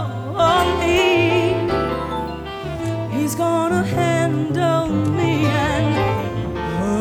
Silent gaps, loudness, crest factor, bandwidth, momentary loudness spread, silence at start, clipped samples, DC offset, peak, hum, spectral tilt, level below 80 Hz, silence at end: none; -19 LUFS; 14 dB; 17 kHz; 9 LU; 0 s; under 0.1%; under 0.1%; -4 dBFS; none; -6 dB/octave; -38 dBFS; 0 s